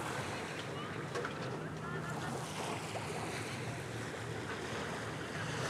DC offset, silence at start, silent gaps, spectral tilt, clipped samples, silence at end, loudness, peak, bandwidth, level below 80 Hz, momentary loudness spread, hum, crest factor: under 0.1%; 0 s; none; -4.5 dB/octave; under 0.1%; 0 s; -41 LUFS; -26 dBFS; 16 kHz; -66 dBFS; 2 LU; none; 16 dB